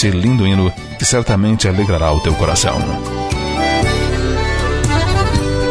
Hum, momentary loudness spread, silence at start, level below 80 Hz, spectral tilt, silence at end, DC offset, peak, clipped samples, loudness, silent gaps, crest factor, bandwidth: none; 5 LU; 0 s; -22 dBFS; -5 dB/octave; 0 s; under 0.1%; 0 dBFS; under 0.1%; -15 LUFS; none; 14 dB; 11 kHz